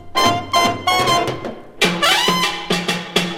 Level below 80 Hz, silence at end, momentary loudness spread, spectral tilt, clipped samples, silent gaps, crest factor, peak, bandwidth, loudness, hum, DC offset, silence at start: -46 dBFS; 0 s; 7 LU; -3 dB/octave; under 0.1%; none; 18 dB; 0 dBFS; 17 kHz; -16 LUFS; none; under 0.1%; 0 s